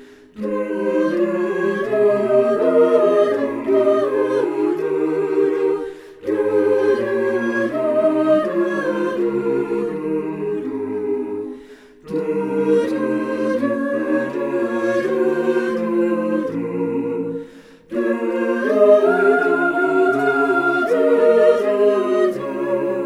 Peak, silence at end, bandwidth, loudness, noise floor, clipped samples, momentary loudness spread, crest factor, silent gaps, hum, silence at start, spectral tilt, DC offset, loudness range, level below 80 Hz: -2 dBFS; 0 s; 12 kHz; -18 LUFS; -42 dBFS; under 0.1%; 9 LU; 16 dB; none; none; 0 s; -7 dB/octave; under 0.1%; 6 LU; -64 dBFS